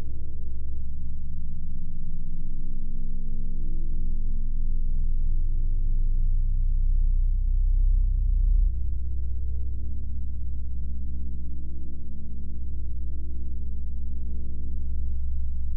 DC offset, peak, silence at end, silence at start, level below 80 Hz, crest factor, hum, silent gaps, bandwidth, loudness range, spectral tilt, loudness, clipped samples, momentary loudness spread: under 0.1%; -14 dBFS; 0 s; 0 s; -24 dBFS; 8 dB; none; none; 0.5 kHz; 8 LU; -13 dB/octave; -33 LUFS; under 0.1%; 10 LU